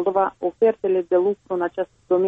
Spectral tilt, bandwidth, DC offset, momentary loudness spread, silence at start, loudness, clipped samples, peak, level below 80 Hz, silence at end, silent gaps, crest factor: -8.5 dB/octave; 3.8 kHz; under 0.1%; 6 LU; 0 s; -22 LUFS; under 0.1%; -8 dBFS; -64 dBFS; 0 s; none; 14 dB